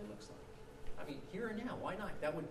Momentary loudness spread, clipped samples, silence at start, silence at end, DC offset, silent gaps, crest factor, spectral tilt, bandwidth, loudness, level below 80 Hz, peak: 14 LU; under 0.1%; 0 s; 0 s; under 0.1%; none; 16 dB; -6 dB/octave; 13.5 kHz; -45 LUFS; -56 dBFS; -28 dBFS